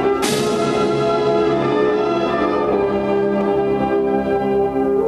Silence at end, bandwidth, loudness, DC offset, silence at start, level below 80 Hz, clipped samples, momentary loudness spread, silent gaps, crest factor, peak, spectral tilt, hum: 0 s; 13.5 kHz; -18 LUFS; under 0.1%; 0 s; -44 dBFS; under 0.1%; 1 LU; none; 12 dB; -6 dBFS; -5.5 dB/octave; none